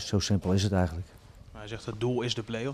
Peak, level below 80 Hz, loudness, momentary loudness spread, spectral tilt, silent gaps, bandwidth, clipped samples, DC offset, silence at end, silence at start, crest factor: -12 dBFS; -48 dBFS; -29 LUFS; 18 LU; -5.5 dB/octave; none; 14.5 kHz; under 0.1%; under 0.1%; 0 s; 0 s; 18 dB